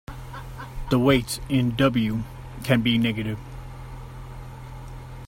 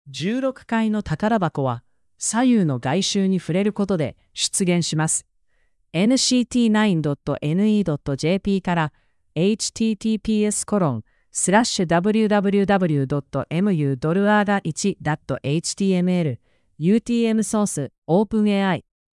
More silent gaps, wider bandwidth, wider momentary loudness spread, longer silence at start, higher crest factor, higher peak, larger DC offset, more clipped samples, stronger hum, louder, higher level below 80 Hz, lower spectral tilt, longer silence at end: second, none vs 17.98-18.02 s; first, 16.5 kHz vs 12 kHz; first, 19 LU vs 8 LU; about the same, 0.1 s vs 0.05 s; about the same, 20 dB vs 16 dB; about the same, -4 dBFS vs -4 dBFS; neither; neither; neither; about the same, -23 LUFS vs -21 LUFS; first, -40 dBFS vs -52 dBFS; about the same, -6 dB/octave vs -5 dB/octave; second, 0 s vs 0.35 s